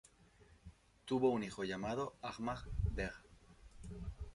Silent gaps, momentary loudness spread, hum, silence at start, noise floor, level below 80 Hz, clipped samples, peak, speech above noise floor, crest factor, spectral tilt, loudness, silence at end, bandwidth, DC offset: none; 25 LU; none; 0.4 s; -66 dBFS; -50 dBFS; under 0.1%; -22 dBFS; 27 dB; 20 dB; -6.5 dB/octave; -41 LUFS; 0 s; 11.5 kHz; under 0.1%